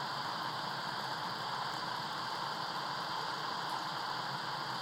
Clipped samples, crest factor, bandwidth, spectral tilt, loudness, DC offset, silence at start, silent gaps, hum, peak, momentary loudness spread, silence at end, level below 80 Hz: under 0.1%; 14 dB; 16 kHz; -3 dB/octave; -38 LUFS; under 0.1%; 0 s; none; none; -24 dBFS; 1 LU; 0 s; -78 dBFS